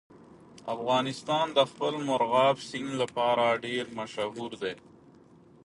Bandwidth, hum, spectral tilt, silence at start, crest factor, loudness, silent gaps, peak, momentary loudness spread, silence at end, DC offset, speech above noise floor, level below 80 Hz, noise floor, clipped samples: 11.5 kHz; none; -4.5 dB/octave; 0.15 s; 20 dB; -29 LUFS; none; -10 dBFS; 12 LU; 0.85 s; under 0.1%; 28 dB; -72 dBFS; -56 dBFS; under 0.1%